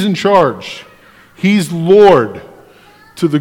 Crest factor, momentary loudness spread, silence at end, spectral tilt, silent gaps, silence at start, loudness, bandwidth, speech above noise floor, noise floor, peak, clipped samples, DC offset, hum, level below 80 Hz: 12 dB; 21 LU; 0 s; -6.5 dB/octave; none; 0 s; -11 LUFS; 15.5 kHz; 32 dB; -43 dBFS; 0 dBFS; 1%; under 0.1%; none; -48 dBFS